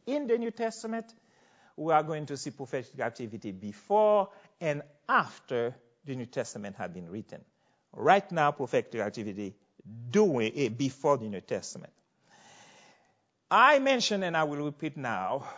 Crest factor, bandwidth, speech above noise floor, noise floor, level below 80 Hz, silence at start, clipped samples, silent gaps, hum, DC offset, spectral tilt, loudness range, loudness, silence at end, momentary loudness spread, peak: 24 dB; 8 kHz; 42 dB; -72 dBFS; -74 dBFS; 0.05 s; under 0.1%; none; none; under 0.1%; -5 dB/octave; 6 LU; -29 LUFS; 0 s; 16 LU; -6 dBFS